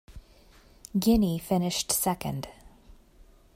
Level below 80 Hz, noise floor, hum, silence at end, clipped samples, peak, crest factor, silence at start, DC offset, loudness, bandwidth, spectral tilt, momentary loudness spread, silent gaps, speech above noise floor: -46 dBFS; -56 dBFS; none; 0.9 s; under 0.1%; -12 dBFS; 18 dB; 0.1 s; under 0.1%; -27 LUFS; 16 kHz; -4.5 dB/octave; 12 LU; none; 30 dB